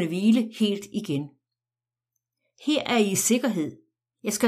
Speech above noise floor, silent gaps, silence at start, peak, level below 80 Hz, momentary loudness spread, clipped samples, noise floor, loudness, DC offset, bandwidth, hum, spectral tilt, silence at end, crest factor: over 66 dB; none; 0 s; -8 dBFS; -72 dBFS; 12 LU; under 0.1%; under -90 dBFS; -25 LUFS; under 0.1%; 15.5 kHz; none; -4 dB/octave; 0 s; 18 dB